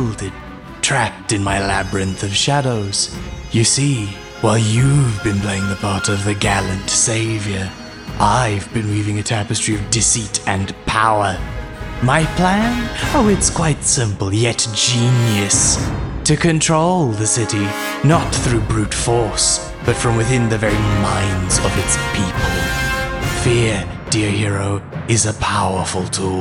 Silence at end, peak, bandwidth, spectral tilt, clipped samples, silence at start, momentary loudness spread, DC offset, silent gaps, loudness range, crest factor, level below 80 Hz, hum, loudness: 0 s; 0 dBFS; 16.5 kHz; -4 dB/octave; under 0.1%; 0 s; 7 LU; under 0.1%; none; 3 LU; 16 dB; -32 dBFS; none; -16 LUFS